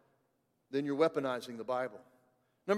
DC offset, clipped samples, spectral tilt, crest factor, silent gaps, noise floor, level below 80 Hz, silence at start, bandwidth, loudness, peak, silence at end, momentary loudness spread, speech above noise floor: under 0.1%; under 0.1%; -6 dB/octave; 20 dB; none; -78 dBFS; -90 dBFS; 0.7 s; 14.5 kHz; -35 LUFS; -16 dBFS; 0 s; 10 LU; 43 dB